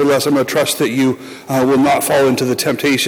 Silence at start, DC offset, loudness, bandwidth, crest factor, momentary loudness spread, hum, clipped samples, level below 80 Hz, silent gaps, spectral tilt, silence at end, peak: 0 s; under 0.1%; -14 LUFS; 19 kHz; 10 dB; 5 LU; none; under 0.1%; -54 dBFS; none; -4 dB/octave; 0 s; -6 dBFS